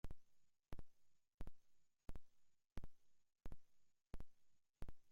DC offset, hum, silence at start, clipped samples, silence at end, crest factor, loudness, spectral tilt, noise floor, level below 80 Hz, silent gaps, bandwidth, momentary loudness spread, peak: under 0.1%; none; 0.05 s; under 0.1%; 0 s; 14 dB; -65 LUFS; -6.5 dB/octave; -72 dBFS; -60 dBFS; 1.34-1.38 s; 10 kHz; 5 LU; -38 dBFS